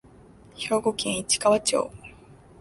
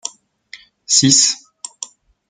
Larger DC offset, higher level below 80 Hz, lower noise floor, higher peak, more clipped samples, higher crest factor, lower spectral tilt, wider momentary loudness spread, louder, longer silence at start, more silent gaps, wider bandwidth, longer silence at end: neither; first, -56 dBFS vs -62 dBFS; first, -51 dBFS vs -43 dBFS; second, -8 dBFS vs 0 dBFS; neither; about the same, 18 dB vs 20 dB; about the same, -2.5 dB/octave vs -1.5 dB/octave; second, 14 LU vs 22 LU; second, -24 LUFS vs -12 LUFS; first, 0.55 s vs 0.05 s; neither; about the same, 12 kHz vs 11 kHz; second, 0.3 s vs 0.45 s